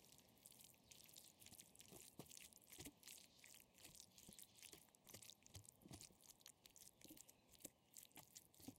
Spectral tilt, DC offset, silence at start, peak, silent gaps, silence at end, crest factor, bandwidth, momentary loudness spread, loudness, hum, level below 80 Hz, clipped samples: -2 dB/octave; under 0.1%; 0 s; -38 dBFS; none; 0 s; 28 dB; 16.5 kHz; 4 LU; -63 LUFS; none; -84 dBFS; under 0.1%